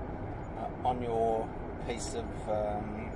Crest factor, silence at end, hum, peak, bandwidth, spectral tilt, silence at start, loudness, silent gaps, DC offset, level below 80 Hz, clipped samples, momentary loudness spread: 16 dB; 0 s; none; -18 dBFS; 11.5 kHz; -6 dB/octave; 0 s; -35 LUFS; none; under 0.1%; -46 dBFS; under 0.1%; 9 LU